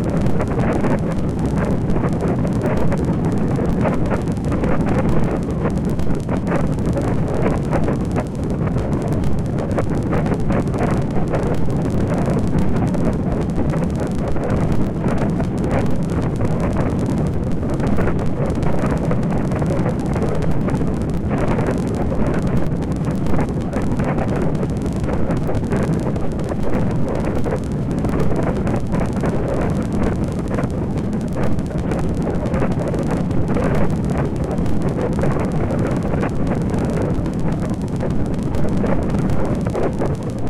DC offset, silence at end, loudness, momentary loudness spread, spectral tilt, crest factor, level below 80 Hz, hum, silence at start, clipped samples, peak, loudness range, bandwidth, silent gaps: under 0.1%; 0 s; -20 LUFS; 3 LU; -8.5 dB/octave; 14 dB; -28 dBFS; none; 0 s; under 0.1%; -4 dBFS; 1 LU; 12.5 kHz; none